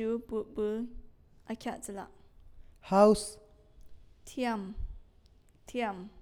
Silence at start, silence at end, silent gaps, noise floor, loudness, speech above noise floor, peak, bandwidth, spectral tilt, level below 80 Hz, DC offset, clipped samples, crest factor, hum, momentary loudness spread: 0 s; 0 s; none; -61 dBFS; -32 LUFS; 30 dB; -10 dBFS; 15.5 kHz; -5.5 dB/octave; -50 dBFS; under 0.1%; under 0.1%; 22 dB; none; 21 LU